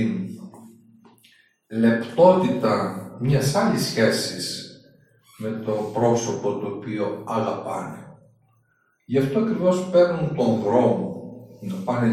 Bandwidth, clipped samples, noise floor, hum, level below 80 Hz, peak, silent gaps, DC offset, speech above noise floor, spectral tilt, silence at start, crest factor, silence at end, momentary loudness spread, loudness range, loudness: 14.5 kHz; under 0.1%; -66 dBFS; none; -58 dBFS; -2 dBFS; none; under 0.1%; 45 dB; -6 dB/octave; 0 s; 20 dB; 0 s; 15 LU; 6 LU; -22 LUFS